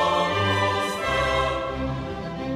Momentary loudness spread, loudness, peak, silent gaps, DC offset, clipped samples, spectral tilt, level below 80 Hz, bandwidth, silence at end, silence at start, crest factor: 9 LU; -24 LUFS; -10 dBFS; none; under 0.1%; under 0.1%; -5 dB/octave; -40 dBFS; 15.5 kHz; 0 s; 0 s; 14 dB